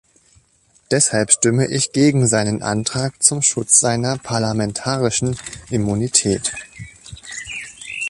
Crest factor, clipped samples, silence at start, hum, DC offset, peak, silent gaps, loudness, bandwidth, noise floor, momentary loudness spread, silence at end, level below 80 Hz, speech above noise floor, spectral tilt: 20 dB; under 0.1%; 0.9 s; none; under 0.1%; 0 dBFS; none; -17 LUFS; 11.5 kHz; -57 dBFS; 16 LU; 0 s; -48 dBFS; 39 dB; -3.5 dB/octave